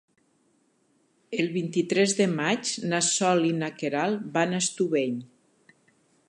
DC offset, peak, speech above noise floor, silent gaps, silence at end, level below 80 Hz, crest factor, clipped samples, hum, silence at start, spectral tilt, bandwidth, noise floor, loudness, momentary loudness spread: under 0.1%; -10 dBFS; 42 dB; none; 1.05 s; -78 dBFS; 18 dB; under 0.1%; none; 1.3 s; -4 dB/octave; 11.5 kHz; -68 dBFS; -26 LUFS; 7 LU